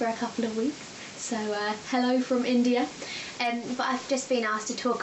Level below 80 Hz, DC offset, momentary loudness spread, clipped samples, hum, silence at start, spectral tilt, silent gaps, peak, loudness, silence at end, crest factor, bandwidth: -70 dBFS; under 0.1%; 9 LU; under 0.1%; none; 0 s; -3 dB/octave; none; -12 dBFS; -28 LUFS; 0 s; 16 dB; 8.4 kHz